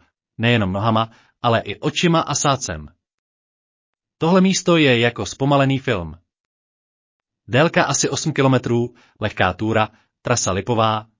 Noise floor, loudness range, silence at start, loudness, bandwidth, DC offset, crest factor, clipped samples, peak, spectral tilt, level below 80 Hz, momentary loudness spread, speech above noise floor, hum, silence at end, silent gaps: under -90 dBFS; 2 LU; 0.4 s; -19 LUFS; 7.8 kHz; under 0.1%; 16 dB; under 0.1%; -2 dBFS; -4.5 dB/octave; -46 dBFS; 10 LU; over 72 dB; none; 0.15 s; 3.14-3.93 s, 6.40-7.20 s